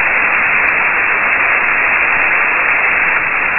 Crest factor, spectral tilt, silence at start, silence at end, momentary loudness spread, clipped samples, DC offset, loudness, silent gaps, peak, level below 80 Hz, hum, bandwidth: 12 dB; -6.5 dB/octave; 0 s; 0 s; 1 LU; under 0.1%; under 0.1%; -10 LUFS; none; 0 dBFS; -42 dBFS; none; 4.1 kHz